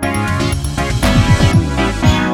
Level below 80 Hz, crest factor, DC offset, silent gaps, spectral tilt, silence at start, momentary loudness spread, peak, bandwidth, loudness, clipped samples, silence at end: -22 dBFS; 12 dB; under 0.1%; none; -5.5 dB/octave; 0 s; 6 LU; 0 dBFS; 18 kHz; -14 LUFS; under 0.1%; 0 s